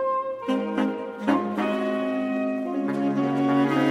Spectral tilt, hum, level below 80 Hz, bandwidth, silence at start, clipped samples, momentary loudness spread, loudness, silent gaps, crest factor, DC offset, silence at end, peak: -7 dB/octave; none; -70 dBFS; 10.5 kHz; 0 s; under 0.1%; 5 LU; -25 LUFS; none; 18 dB; under 0.1%; 0 s; -6 dBFS